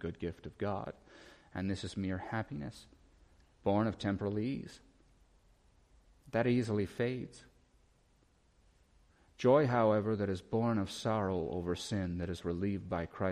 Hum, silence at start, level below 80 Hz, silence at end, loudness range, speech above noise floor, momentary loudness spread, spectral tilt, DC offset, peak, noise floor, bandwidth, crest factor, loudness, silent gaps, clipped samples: none; 0 s; -60 dBFS; 0 s; 6 LU; 35 dB; 14 LU; -7 dB/octave; under 0.1%; -16 dBFS; -69 dBFS; 12.5 kHz; 20 dB; -35 LUFS; none; under 0.1%